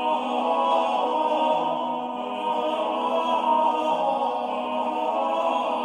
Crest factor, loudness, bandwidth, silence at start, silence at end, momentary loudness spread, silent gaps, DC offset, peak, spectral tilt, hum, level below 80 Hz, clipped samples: 14 dB; -24 LUFS; 10.5 kHz; 0 s; 0 s; 6 LU; none; under 0.1%; -10 dBFS; -4.5 dB/octave; none; -68 dBFS; under 0.1%